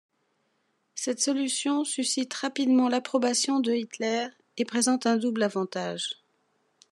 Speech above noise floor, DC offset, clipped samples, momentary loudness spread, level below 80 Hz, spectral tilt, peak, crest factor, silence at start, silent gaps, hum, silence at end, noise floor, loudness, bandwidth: 47 dB; under 0.1%; under 0.1%; 10 LU; -88 dBFS; -3 dB/octave; -12 dBFS; 16 dB; 0.95 s; none; none; 0.8 s; -73 dBFS; -27 LUFS; 12.5 kHz